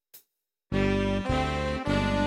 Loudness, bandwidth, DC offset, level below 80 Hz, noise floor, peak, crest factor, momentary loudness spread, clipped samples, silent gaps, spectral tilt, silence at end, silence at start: -28 LUFS; 16.5 kHz; under 0.1%; -38 dBFS; -77 dBFS; -14 dBFS; 14 dB; 3 LU; under 0.1%; none; -6.5 dB/octave; 0 s; 0.15 s